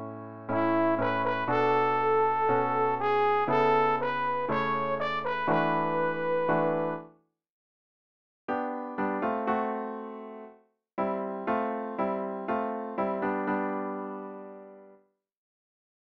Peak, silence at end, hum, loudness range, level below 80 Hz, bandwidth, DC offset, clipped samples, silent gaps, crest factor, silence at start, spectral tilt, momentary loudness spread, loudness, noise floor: -14 dBFS; 0.6 s; none; 8 LU; -66 dBFS; 6.4 kHz; under 0.1%; under 0.1%; 7.50-8.48 s; 16 dB; 0 s; -8 dB/octave; 15 LU; -28 LUFS; -62 dBFS